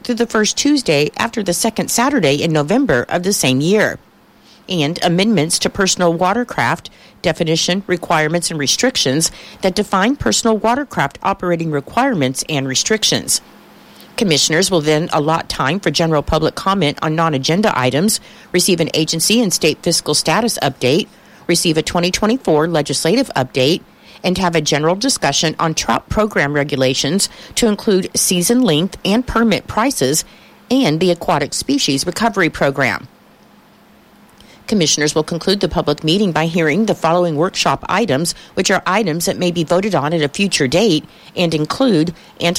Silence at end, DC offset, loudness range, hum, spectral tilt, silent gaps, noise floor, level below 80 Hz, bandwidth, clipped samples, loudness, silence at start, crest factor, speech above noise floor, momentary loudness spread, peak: 0 s; under 0.1%; 2 LU; none; -3.5 dB/octave; none; -47 dBFS; -42 dBFS; 16.5 kHz; under 0.1%; -15 LUFS; 0.05 s; 14 dB; 31 dB; 5 LU; -2 dBFS